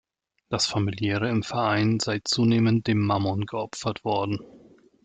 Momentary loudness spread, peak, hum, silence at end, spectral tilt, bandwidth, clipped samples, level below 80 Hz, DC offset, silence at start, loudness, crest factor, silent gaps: 9 LU; -10 dBFS; none; 0.45 s; -5.5 dB/octave; 9.4 kHz; under 0.1%; -60 dBFS; under 0.1%; 0.5 s; -25 LUFS; 14 dB; none